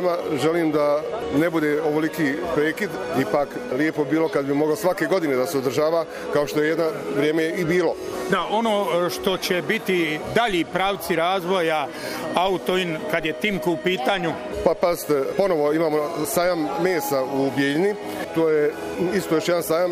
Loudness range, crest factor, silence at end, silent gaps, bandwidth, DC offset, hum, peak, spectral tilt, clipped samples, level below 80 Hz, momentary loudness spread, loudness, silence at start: 1 LU; 18 dB; 0 s; none; 15.5 kHz; under 0.1%; none; -4 dBFS; -5 dB/octave; under 0.1%; -52 dBFS; 4 LU; -22 LUFS; 0 s